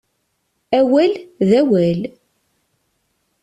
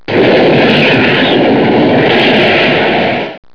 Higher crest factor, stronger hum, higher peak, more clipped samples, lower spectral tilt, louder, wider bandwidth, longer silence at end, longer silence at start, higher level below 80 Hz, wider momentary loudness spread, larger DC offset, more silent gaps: first, 16 dB vs 8 dB; neither; about the same, -2 dBFS vs 0 dBFS; second, under 0.1% vs 0.3%; about the same, -8 dB/octave vs -7 dB/octave; second, -16 LUFS vs -8 LUFS; first, 11 kHz vs 5.4 kHz; first, 1.35 s vs 0.15 s; first, 0.7 s vs 0.1 s; second, -58 dBFS vs -46 dBFS; first, 9 LU vs 3 LU; second, under 0.1% vs 1%; neither